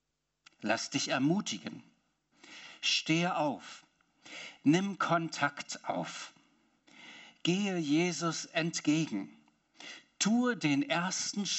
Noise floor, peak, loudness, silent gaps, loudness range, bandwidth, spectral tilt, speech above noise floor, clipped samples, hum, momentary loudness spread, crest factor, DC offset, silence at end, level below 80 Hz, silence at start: -73 dBFS; -14 dBFS; -32 LUFS; none; 2 LU; 8.2 kHz; -4 dB/octave; 41 dB; under 0.1%; none; 20 LU; 20 dB; under 0.1%; 0 s; -82 dBFS; 0.6 s